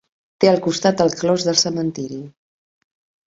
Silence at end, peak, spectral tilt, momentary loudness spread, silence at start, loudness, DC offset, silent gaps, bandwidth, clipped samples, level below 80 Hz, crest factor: 0.95 s; 0 dBFS; -4 dB/octave; 13 LU; 0.4 s; -18 LUFS; under 0.1%; none; 8 kHz; under 0.1%; -58 dBFS; 20 dB